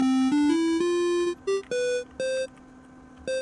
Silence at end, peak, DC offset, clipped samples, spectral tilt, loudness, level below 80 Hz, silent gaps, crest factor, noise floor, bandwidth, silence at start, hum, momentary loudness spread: 0 s; -14 dBFS; under 0.1%; under 0.1%; -4 dB/octave; -26 LUFS; -60 dBFS; none; 12 dB; -49 dBFS; 11.5 kHz; 0 s; none; 10 LU